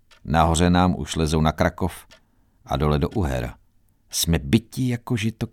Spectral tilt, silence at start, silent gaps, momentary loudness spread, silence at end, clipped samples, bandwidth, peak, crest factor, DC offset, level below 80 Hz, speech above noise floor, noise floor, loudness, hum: -5.5 dB/octave; 0.25 s; none; 11 LU; 0.05 s; under 0.1%; 18 kHz; -4 dBFS; 18 dB; under 0.1%; -34 dBFS; 38 dB; -59 dBFS; -22 LUFS; none